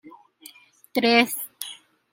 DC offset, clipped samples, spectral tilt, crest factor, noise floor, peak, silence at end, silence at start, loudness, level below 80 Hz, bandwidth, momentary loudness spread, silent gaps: under 0.1%; under 0.1%; -2.5 dB/octave; 24 dB; -50 dBFS; -4 dBFS; 0.4 s; 0.05 s; -22 LUFS; -76 dBFS; 16.5 kHz; 18 LU; none